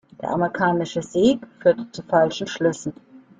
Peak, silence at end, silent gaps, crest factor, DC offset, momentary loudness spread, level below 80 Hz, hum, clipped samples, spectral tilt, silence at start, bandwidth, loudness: -4 dBFS; 0.2 s; none; 18 dB; under 0.1%; 8 LU; -58 dBFS; none; under 0.1%; -5.5 dB/octave; 0.2 s; 9.4 kHz; -22 LUFS